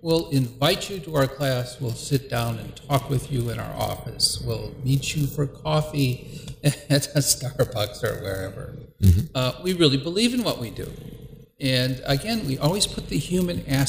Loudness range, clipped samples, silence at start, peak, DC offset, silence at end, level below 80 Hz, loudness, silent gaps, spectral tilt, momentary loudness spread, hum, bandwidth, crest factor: 3 LU; under 0.1%; 0.05 s; -4 dBFS; under 0.1%; 0 s; -42 dBFS; -24 LUFS; none; -5 dB/octave; 10 LU; none; 16 kHz; 20 dB